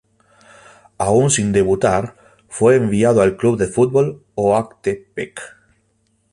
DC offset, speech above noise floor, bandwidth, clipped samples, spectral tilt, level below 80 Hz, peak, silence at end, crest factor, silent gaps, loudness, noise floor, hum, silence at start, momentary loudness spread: under 0.1%; 47 dB; 11.5 kHz; under 0.1%; -5.5 dB/octave; -46 dBFS; -2 dBFS; 0.85 s; 16 dB; none; -17 LUFS; -63 dBFS; none; 1 s; 15 LU